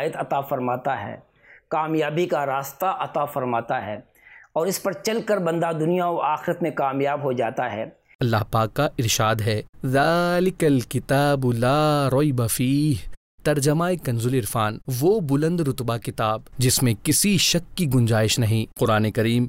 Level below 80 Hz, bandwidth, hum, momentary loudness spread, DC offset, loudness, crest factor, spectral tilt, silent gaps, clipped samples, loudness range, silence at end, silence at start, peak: -48 dBFS; 16 kHz; none; 7 LU; under 0.1%; -22 LUFS; 12 dB; -5 dB/octave; 8.15-8.19 s, 9.69-9.73 s, 13.17-13.38 s; under 0.1%; 5 LU; 0 s; 0 s; -10 dBFS